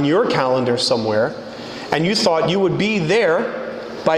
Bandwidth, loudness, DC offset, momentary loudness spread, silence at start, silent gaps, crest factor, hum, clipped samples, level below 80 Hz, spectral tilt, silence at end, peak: 12 kHz; -18 LUFS; under 0.1%; 12 LU; 0 s; none; 16 dB; none; under 0.1%; -54 dBFS; -5 dB/octave; 0 s; -2 dBFS